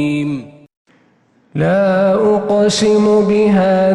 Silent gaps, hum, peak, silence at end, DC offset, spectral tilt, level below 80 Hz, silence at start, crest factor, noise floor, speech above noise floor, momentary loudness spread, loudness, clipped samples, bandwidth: 0.77-0.85 s; none; -4 dBFS; 0 s; under 0.1%; -6 dB/octave; -50 dBFS; 0 s; 10 dB; -54 dBFS; 42 dB; 9 LU; -13 LUFS; under 0.1%; 11.5 kHz